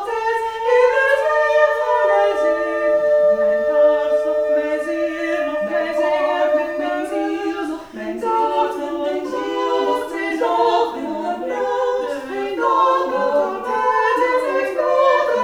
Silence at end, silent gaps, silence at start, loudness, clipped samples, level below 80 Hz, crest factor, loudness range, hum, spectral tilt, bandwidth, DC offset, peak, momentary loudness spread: 0 s; none; 0 s; -18 LUFS; under 0.1%; -56 dBFS; 16 dB; 5 LU; none; -4 dB/octave; 13 kHz; under 0.1%; -2 dBFS; 8 LU